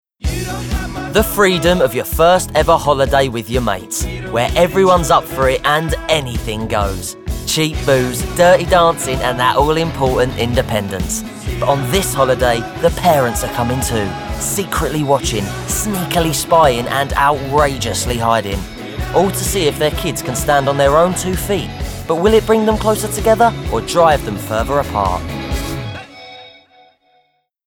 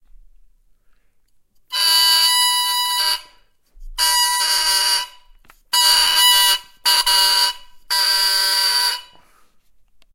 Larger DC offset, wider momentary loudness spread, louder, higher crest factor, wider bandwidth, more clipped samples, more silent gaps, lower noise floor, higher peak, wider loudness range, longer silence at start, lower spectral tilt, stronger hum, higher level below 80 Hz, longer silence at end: neither; about the same, 10 LU vs 9 LU; about the same, -15 LUFS vs -14 LUFS; about the same, 14 dB vs 18 dB; first, over 20 kHz vs 16 kHz; neither; neither; first, -60 dBFS vs -56 dBFS; about the same, 0 dBFS vs -2 dBFS; about the same, 3 LU vs 3 LU; second, 0.2 s vs 1.7 s; first, -4.5 dB/octave vs 4 dB/octave; neither; first, -28 dBFS vs -48 dBFS; about the same, 1.2 s vs 1.1 s